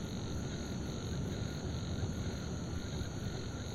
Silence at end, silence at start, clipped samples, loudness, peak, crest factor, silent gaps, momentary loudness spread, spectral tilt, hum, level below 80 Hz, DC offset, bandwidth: 0 s; 0 s; under 0.1%; -40 LUFS; -26 dBFS; 14 dB; none; 2 LU; -5.5 dB/octave; none; -48 dBFS; 0.1%; 16 kHz